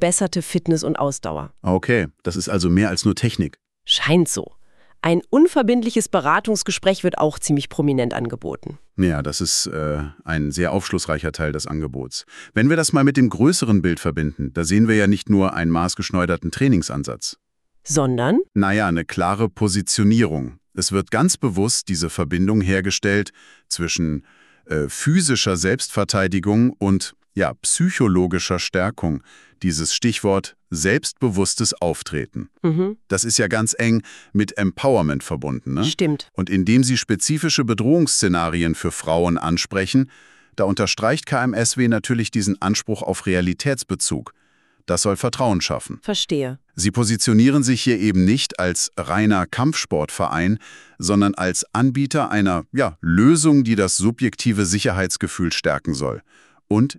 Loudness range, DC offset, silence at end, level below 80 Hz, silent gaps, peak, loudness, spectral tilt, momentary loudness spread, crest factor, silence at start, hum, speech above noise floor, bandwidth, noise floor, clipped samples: 4 LU; under 0.1%; 0.05 s; -44 dBFS; none; -4 dBFS; -20 LUFS; -4.5 dB/octave; 9 LU; 16 dB; 0 s; none; 41 dB; 13.5 kHz; -60 dBFS; under 0.1%